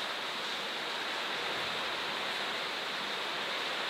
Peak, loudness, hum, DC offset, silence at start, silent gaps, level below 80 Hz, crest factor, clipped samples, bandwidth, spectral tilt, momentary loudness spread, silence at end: -22 dBFS; -34 LUFS; none; under 0.1%; 0 s; none; -76 dBFS; 14 dB; under 0.1%; 16 kHz; -1 dB/octave; 1 LU; 0 s